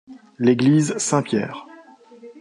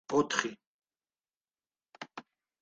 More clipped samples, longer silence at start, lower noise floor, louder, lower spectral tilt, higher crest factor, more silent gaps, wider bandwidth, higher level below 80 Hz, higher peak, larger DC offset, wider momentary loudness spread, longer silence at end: neither; about the same, 0.1 s vs 0.1 s; second, -46 dBFS vs under -90 dBFS; first, -19 LUFS vs -32 LUFS; first, -5.5 dB/octave vs -3 dB/octave; second, 18 dB vs 26 dB; second, none vs 0.67-0.79 s, 1.37-1.41 s; first, 11.5 kHz vs 9 kHz; first, -66 dBFS vs -76 dBFS; first, -4 dBFS vs -10 dBFS; neither; second, 12 LU vs 20 LU; second, 0 s vs 0.4 s